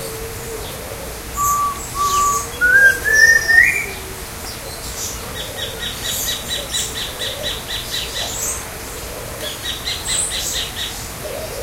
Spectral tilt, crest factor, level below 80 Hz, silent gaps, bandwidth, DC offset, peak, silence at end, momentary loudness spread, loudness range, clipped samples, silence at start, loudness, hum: -1 dB/octave; 20 dB; -36 dBFS; none; 16 kHz; under 0.1%; 0 dBFS; 0 s; 17 LU; 10 LU; under 0.1%; 0 s; -17 LUFS; none